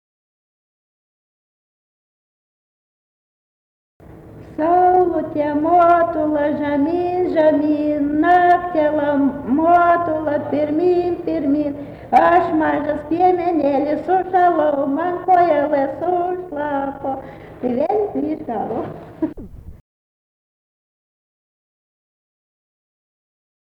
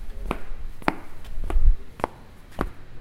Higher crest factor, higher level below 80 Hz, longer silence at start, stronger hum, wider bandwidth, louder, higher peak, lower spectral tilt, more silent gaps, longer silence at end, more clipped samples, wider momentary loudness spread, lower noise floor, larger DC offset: second, 14 dB vs 24 dB; second, -50 dBFS vs -26 dBFS; first, 4.1 s vs 0 s; neither; about the same, 5.6 kHz vs 5.4 kHz; first, -17 LUFS vs -30 LUFS; second, -4 dBFS vs 0 dBFS; first, -8.5 dB/octave vs -6.5 dB/octave; neither; first, 4.05 s vs 0 s; neither; second, 12 LU vs 16 LU; second, -39 dBFS vs -43 dBFS; neither